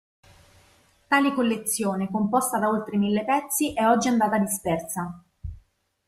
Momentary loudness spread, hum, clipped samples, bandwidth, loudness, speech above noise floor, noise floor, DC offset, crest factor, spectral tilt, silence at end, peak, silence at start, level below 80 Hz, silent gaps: 13 LU; none; under 0.1%; 15.5 kHz; -24 LUFS; 36 dB; -60 dBFS; under 0.1%; 18 dB; -4.5 dB/octave; 0.5 s; -8 dBFS; 1.1 s; -52 dBFS; none